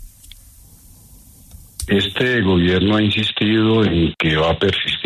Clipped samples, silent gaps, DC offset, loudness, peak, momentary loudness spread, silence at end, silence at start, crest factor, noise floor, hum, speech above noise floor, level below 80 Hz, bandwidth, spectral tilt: under 0.1%; none; under 0.1%; -16 LUFS; -4 dBFS; 3 LU; 0 s; 0 s; 14 dB; -45 dBFS; none; 29 dB; -38 dBFS; 13.5 kHz; -6 dB/octave